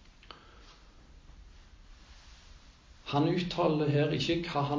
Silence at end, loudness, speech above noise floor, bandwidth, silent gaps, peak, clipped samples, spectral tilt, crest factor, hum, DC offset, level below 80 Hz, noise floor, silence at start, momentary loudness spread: 0 s; -30 LUFS; 27 dB; 7.6 kHz; none; -14 dBFS; under 0.1%; -6.5 dB/octave; 20 dB; none; under 0.1%; -56 dBFS; -56 dBFS; 0.25 s; 24 LU